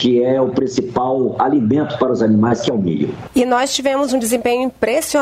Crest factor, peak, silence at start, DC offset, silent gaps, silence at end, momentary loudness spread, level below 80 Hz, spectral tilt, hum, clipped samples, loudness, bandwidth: 12 dB; -2 dBFS; 0 s; under 0.1%; none; 0 s; 5 LU; -50 dBFS; -5 dB/octave; none; under 0.1%; -16 LUFS; 16 kHz